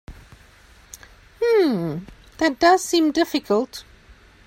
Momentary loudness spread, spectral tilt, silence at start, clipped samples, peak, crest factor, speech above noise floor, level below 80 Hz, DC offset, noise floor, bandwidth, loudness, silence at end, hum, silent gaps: 14 LU; -4.5 dB/octave; 0.1 s; under 0.1%; -4 dBFS; 20 dB; 30 dB; -50 dBFS; under 0.1%; -50 dBFS; 16 kHz; -20 LUFS; 0.65 s; none; none